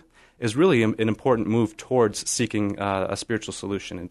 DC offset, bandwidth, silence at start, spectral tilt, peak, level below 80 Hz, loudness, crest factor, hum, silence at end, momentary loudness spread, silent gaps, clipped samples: under 0.1%; 12.5 kHz; 0.4 s; -5 dB/octave; -8 dBFS; -56 dBFS; -24 LUFS; 16 dB; none; 0 s; 11 LU; none; under 0.1%